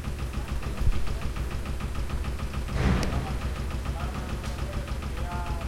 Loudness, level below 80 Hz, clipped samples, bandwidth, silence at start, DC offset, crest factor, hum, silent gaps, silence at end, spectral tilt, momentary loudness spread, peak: -32 LUFS; -32 dBFS; under 0.1%; 16 kHz; 0 s; under 0.1%; 18 dB; none; none; 0 s; -6 dB/octave; 6 LU; -12 dBFS